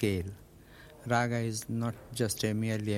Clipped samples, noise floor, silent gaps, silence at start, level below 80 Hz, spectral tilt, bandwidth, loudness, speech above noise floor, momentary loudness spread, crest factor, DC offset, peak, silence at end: under 0.1%; -54 dBFS; none; 0 s; -58 dBFS; -5 dB/octave; 16.5 kHz; -32 LUFS; 22 dB; 16 LU; 18 dB; under 0.1%; -14 dBFS; 0 s